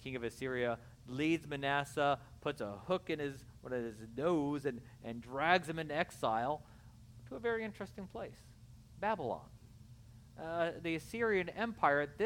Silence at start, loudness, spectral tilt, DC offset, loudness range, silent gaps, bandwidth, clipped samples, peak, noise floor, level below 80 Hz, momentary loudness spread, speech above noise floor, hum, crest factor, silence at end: 0 s; -37 LUFS; -5.5 dB/octave; under 0.1%; 6 LU; none; 17 kHz; under 0.1%; -14 dBFS; -57 dBFS; -64 dBFS; 15 LU; 20 dB; none; 24 dB; 0 s